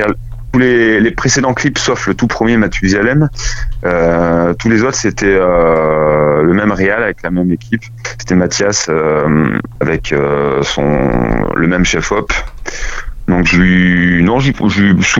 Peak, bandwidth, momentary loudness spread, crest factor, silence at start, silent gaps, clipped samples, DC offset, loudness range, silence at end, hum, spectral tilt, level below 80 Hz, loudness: 0 dBFS; 8 kHz; 9 LU; 12 dB; 0 s; none; under 0.1%; under 0.1%; 2 LU; 0 s; none; -5 dB/octave; -26 dBFS; -12 LUFS